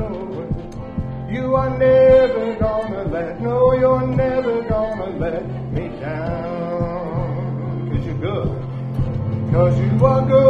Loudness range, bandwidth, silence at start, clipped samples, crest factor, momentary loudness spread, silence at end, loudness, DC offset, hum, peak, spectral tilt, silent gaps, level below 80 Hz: 8 LU; 6.4 kHz; 0 s; under 0.1%; 16 dB; 12 LU; 0 s; -19 LUFS; under 0.1%; none; -2 dBFS; -9.5 dB/octave; none; -34 dBFS